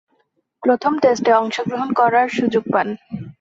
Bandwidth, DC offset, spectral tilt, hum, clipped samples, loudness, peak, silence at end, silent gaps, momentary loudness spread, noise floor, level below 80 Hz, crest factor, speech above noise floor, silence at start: 8 kHz; under 0.1%; -5.5 dB/octave; none; under 0.1%; -18 LUFS; -2 dBFS; 0.1 s; none; 8 LU; -66 dBFS; -60 dBFS; 16 dB; 49 dB; 0.6 s